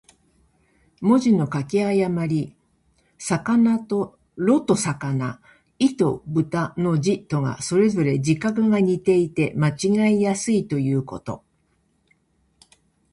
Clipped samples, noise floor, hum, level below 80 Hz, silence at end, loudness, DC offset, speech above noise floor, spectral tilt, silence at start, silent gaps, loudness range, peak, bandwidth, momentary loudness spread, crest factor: under 0.1%; -66 dBFS; none; -56 dBFS; 1.75 s; -21 LUFS; under 0.1%; 46 dB; -6.5 dB/octave; 1 s; none; 3 LU; -6 dBFS; 11.5 kHz; 8 LU; 16 dB